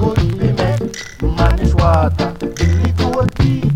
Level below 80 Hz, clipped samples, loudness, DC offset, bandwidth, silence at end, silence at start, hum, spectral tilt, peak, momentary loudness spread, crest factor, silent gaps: -22 dBFS; under 0.1%; -16 LUFS; under 0.1%; 12 kHz; 0 s; 0 s; none; -7 dB/octave; 0 dBFS; 7 LU; 14 dB; none